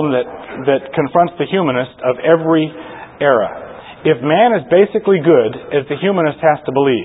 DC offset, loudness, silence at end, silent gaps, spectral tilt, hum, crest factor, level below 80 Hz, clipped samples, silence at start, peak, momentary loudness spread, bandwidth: under 0.1%; -15 LUFS; 0 s; none; -12 dB/octave; none; 14 dB; -54 dBFS; under 0.1%; 0 s; 0 dBFS; 10 LU; 4 kHz